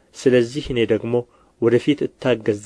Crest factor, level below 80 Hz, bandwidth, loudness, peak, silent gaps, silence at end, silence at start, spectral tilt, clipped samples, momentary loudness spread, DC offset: 16 dB; -48 dBFS; 11 kHz; -20 LUFS; -4 dBFS; none; 0 s; 0.15 s; -6.5 dB/octave; under 0.1%; 6 LU; under 0.1%